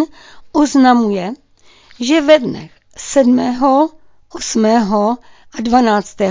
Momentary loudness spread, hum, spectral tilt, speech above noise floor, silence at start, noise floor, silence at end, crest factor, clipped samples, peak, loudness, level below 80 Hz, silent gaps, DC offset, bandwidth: 15 LU; none; -4.5 dB/octave; 34 dB; 0 s; -47 dBFS; 0 s; 14 dB; under 0.1%; 0 dBFS; -14 LUFS; -48 dBFS; none; under 0.1%; 7.6 kHz